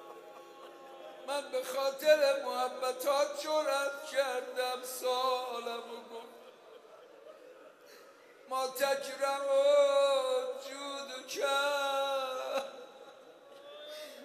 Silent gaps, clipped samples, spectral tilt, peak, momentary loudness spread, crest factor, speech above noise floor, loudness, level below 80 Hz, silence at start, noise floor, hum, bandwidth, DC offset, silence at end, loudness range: none; under 0.1%; 0 dB/octave; -14 dBFS; 24 LU; 20 dB; 25 dB; -32 LUFS; under -90 dBFS; 0 s; -57 dBFS; none; 15.5 kHz; under 0.1%; 0 s; 9 LU